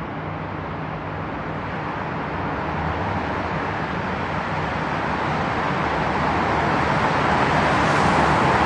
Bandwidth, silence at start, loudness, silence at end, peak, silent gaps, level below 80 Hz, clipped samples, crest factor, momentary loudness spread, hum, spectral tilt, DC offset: 11 kHz; 0 s; -22 LUFS; 0 s; -4 dBFS; none; -40 dBFS; under 0.1%; 18 dB; 11 LU; none; -6 dB/octave; under 0.1%